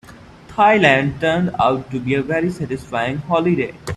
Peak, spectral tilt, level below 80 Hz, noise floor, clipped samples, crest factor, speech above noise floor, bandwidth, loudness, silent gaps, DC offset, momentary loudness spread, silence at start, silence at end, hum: 0 dBFS; -6.5 dB/octave; -48 dBFS; -41 dBFS; under 0.1%; 18 dB; 23 dB; 12.5 kHz; -17 LUFS; none; under 0.1%; 10 LU; 0.1 s; 0 s; none